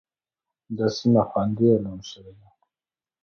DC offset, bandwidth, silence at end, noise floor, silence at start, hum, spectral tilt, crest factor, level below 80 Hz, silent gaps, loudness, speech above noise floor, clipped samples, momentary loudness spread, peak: under 0.1%; 6.8 kHz; 0.95 s; under -90 dBFS; 0.7 s; none; -7.5 dB/octave; 18 dB; -58 dBFS; none; -22 LUFS; over 67 dB; under 0.1%; 17 LU; -6 dBFS